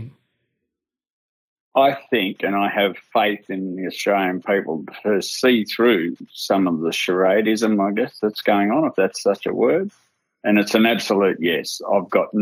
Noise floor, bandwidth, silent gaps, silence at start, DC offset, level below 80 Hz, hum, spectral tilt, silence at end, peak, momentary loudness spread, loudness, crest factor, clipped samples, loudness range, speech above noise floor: -82 dBFS; over 20 kHz; 1.10-1.72 s; 0 s; under 0.1%; -76 dBFS; none; -4.5 dB/octave; 0 s; -2 dBFS; 7 LU; -20 LUFS; 18 dB; under 0.1%; 3 LU; 63 dB